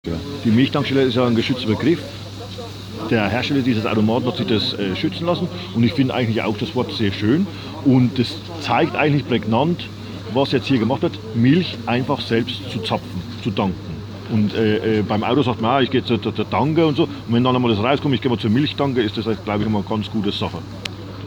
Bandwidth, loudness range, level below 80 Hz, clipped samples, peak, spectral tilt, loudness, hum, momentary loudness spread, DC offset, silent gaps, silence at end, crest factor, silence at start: 20 kHz; 3 LU; -48 dBFS; under 0.1%; -2 dBFS; -7 dB/octave; -20 LUFS; none; 10 LU; under 0.1%; none; 0 s; 16 dB; 0.05 s